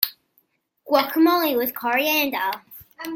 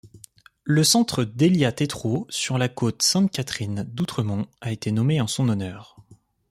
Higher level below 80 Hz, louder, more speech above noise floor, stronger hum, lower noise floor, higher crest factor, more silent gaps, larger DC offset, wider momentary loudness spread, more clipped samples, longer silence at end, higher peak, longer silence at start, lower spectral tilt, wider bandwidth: second, -68 dBFS vs -58 dBFS; about the same, -21 LUFS vs -23 LUFS; first, 46 dB vs 28 dB; neither; first, -66 dBFS vs -51 dBFS; about the same, 22 dB vs 18 dB; neither; neither; about the same, 10 LU vs 10 LU; neither; second, 0 s vs 0.35 s; first, 0 dBFS vs -6 dBFS; about the same, 0 s vs 0.05 s; second, -2.5 dB/octave vs -4.5 dB/octave; about the same, 17 kHz vs 15.5 kHz